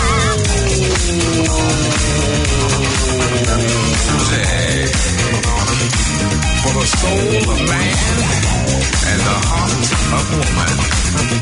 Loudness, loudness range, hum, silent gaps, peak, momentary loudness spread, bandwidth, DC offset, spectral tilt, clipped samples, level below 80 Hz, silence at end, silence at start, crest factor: -14 LUFS; 0 LU; none; none; -2 dBFS; 1 LU; 11 kHz; under 0.1%; -4 dB/octave; under 0.1%; -22 dBFS; 0 s; 0 s; 12 dB